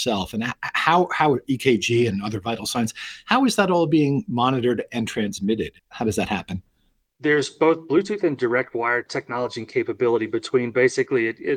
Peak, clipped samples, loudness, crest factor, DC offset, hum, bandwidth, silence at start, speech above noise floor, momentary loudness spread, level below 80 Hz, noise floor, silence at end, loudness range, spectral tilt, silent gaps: -2 dBFS; under 0.1%; -22 LUFS; 20 dB; under 0.1%; none; 16.5 kHz; 0 s; 45 dB; 8 LU; -58 dBFS; -67 dBFS; 0 s; 3 LU; -5 dB/octave; none